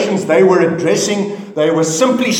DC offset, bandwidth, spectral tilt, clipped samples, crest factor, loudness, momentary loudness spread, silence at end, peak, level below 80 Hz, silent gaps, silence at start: under 0.1%; 17 kHz; -4.5 dB/octave; under 0.1%; 12 dB; -13 LUFS; 7 LU; 0 s; 0 dBFS; -64 dBFS; none; 0 s